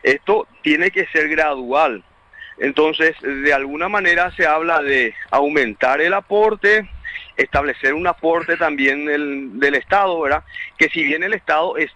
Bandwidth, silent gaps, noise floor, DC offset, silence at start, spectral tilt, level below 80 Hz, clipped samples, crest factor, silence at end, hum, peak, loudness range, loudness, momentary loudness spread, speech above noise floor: 9.8 kHz; none; -41 dBFS; under 0.1%; 0 s; -4.5 dB/octave; -46 dBFS; under 0.1%; 16 dB; 0.05 s; none; -2 dBFS; 2 LU; -17 LUFS; 5 LU; 23 dB